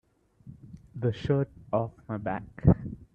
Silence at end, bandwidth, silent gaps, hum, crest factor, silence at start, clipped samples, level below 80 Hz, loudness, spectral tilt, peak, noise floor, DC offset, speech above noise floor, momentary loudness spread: 0.1 s; 6.8 kHz; none; none; 24 dB; 0.45 s; under 0.1%; -44 dBFS; -29 LUFS; -10 dB/octave; -6 dBFS; -52 dBFS; under 0.1%; 25 dB; 18 LU